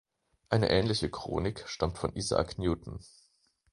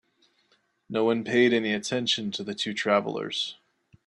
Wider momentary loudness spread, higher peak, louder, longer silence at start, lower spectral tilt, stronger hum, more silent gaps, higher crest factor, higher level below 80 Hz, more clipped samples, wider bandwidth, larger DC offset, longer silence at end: about the same, 9 LU vs 9 LU; about the same, -10 dBFS vs -8 dBFS; second, -31 LUFS vs -26 LUFS; second, 0.5 s vs 0.9 s; first, -5.5 dB/octave vs -4 dB/octave; neither; neither; about the same, 22 dB vs 20 dB; first, -48 dBFS vs -72 dBFS; neither; about the same, 11.5 kHz vs 11 kHz; neither; first, 0.65 s vs 0.5 s